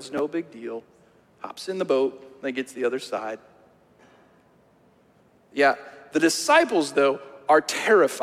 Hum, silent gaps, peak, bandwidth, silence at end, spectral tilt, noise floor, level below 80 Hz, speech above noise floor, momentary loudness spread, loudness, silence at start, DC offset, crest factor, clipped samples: none; none; -6 dBFS; 16 kHz; 0 s; -3 dB/octave; -59 dBFS; -72 dBFS; 36 dB; 17 LU; -23 LUFS; 0 s; under 0.1%; 20 dB; under 0.1%